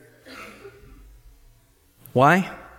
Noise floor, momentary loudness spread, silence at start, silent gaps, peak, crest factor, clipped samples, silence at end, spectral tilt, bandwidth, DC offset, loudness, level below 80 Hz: -58 dBFS; 25 LU; 0.35 s; none; -4 dBFS; 22 dB; under 0.1%; 0.2 s; -6.5 dB/octave; 16.5 kHz; under 0.1%; -19 LUFS; -54 dBFS